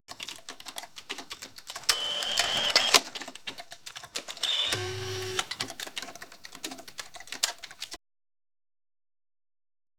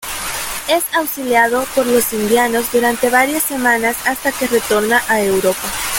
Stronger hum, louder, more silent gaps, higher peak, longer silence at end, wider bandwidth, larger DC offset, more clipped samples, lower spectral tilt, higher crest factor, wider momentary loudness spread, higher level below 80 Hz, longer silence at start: neither; second, -28 LUFS vs -15 LUFS; neither; about the same, 0 dBFS vs 0 dBFS; about the same, 0 s vs 0 s; first, over 20 kHz vs 17 kHz; first, 0.2% vs under 0.1%; neither; second, -0.5 dB/octave vs -2.5 dB/octave; first, 34 dB vs 14 dB; first, 19 LU vs 5 LU; second, -66 dBFS vs -44 dBFS; about the same, 0 s vs 0 s